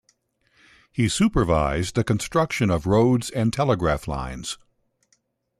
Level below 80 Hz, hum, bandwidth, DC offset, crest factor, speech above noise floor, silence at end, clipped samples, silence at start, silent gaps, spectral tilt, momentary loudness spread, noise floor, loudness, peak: -40 dBFS; none; 14 kHz; under 0.1%; 16 dB; 46 dB; 1.05 s; under 0.1%; 0.95 s; none; -6 dB/octave; 12 LU; -68 dBFS; -22 LUFS; -8 dBFS